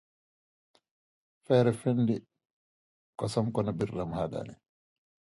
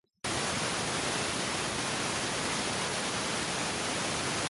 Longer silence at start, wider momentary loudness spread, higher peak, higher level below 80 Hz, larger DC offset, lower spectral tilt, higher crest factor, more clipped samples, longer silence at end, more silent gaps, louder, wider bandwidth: first, 1.5 s vs 0.25 s; first, 13 LU vs 1 LU; first, -10 dBFS vs -18 dBFS; about the same, -60 dBFS vs -56 dBFS; neither; first, -7.5 dB/octave vs -2 dB/octave; first, 22 dB vs 14 dB; neither; first, 0.7 s vs 0 s; first, 2.53-3.13 s vs none; about the same, -30 LUFS vs -31 LUFS; about the same, 11.5 kHz vs 12 kHz